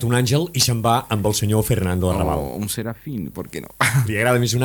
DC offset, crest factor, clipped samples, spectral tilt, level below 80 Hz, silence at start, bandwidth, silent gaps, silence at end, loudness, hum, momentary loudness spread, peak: under 0.1%; 18 dB; under 0.1%; -4.5 dB/octave; -38 dBFS; 0 s; 19 kHz; none; 0 s; -20 LUFS; none; 12 LU; -2 dBFS